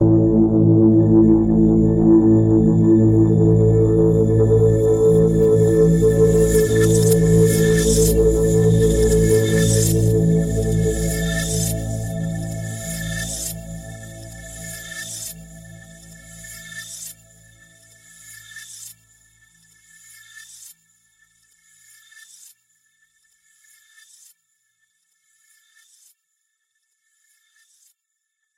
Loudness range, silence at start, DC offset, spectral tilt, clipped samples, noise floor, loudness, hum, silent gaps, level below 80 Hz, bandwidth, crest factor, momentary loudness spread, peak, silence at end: 22 LU; 0 s; under 0.1%; -6.5 dB/octave; under 0.1%; -77 dBFS; -16 LUFS; none; none; -32 dBFS; 16 kHz; 14 dB; 21 LU; -4 dBFS; 9.7 s